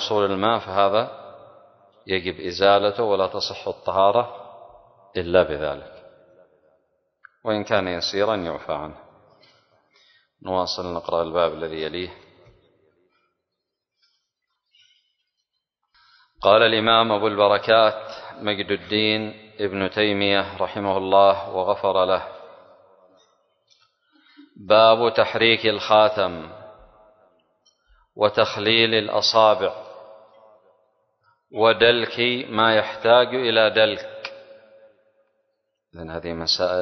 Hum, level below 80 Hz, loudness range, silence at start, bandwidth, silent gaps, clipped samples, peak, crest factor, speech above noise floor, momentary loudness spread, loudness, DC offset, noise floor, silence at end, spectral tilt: none; -54 dBFS; 8 LU; 0 s; 6.4 kHz; none; under 0.1%; -2 dBFS; 20 dB; 61 dB; 16 LU; -20 LUFS; under 0.1%; -82 dBFS; 0 s; -4.5 dB/octave